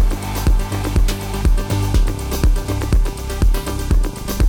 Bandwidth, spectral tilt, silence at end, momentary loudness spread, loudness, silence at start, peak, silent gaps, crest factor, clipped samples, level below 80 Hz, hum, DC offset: 17.5 kHz; -5.5 dB/octave; 0 s; 3 LU; -20 LUFS; 0 s; -4 dBFS; none; 10 dB; under 0.1%; -18 dBFS; none; under 0.1%